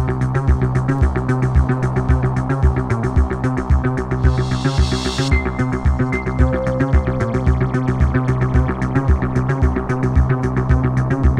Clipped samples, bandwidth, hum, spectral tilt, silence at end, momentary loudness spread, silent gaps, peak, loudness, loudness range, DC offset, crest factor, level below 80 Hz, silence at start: under 0.1%; 9.6 kHz; none; -7.5 dB/octave; 0 s; 2 LU; none; 0 dBFS; -18 LUFS; 1 LU; under 0.1%; 16 dB; -20 dBFS; 0 s